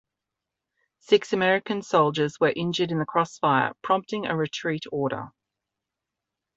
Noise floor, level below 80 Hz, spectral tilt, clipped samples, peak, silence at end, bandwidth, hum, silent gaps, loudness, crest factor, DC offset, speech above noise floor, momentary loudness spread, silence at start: -86 dBFS; -68 dBFS; -5.5 dB/octave; under 0.1%; -6 dBFS; 1.25 s; 8 kHz; none; none; -25 LUFS; 20 dB; under 0.1%; 62 dB; 7 LU; 1.1 s